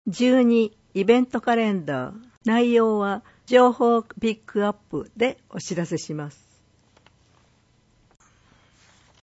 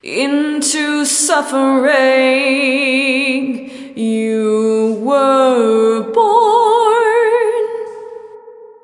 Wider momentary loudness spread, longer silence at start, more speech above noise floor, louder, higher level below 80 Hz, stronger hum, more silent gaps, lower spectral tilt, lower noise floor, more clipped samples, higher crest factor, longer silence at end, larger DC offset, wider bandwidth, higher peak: first, 15 LU vs 11 LU; about the same, 0.05 s vs 0.05 s; first, 40 dB vs 23 dB; second, -22 LUFS vs -13 LUFS; first, -62 dBFS vs -72 dBFS; neither; first, 2.37-2.41 s vs none; first, -6 dB/octave vs -2.5 dB/octave; first, -61 dBFS vs -37 dBFS; neither; first, 20 dB vs 12 dB; first, 2.95 s vs 0.15 s; neither; second, 8 kHz vs 11.5 kHz; second, -4 dBFS vs 0 dBFS